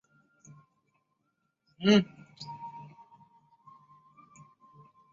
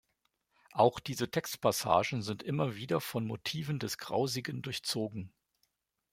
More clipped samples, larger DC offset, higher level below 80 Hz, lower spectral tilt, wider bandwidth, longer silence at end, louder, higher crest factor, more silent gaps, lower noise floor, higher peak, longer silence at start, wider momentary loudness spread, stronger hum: neither; neither; about the same, -72 dBFS vs -68 dBFS; about the same, -5 dB/octave vs -4.5 dB/octave; second, 7.4 kHz vs 16.5 kHz; first, 2.3 s vs 0.85 s; first, -28 LUFS vs -33 LUFS; about the same, 24 dB vs 22 dB; neither; about the same, -79 dBFS vs -80 dBFS; about the same, -10 dBFS vs -12 dBFS; first, 1.8 s vs 0.75 s; first, 24 LU vs 9 LU; neither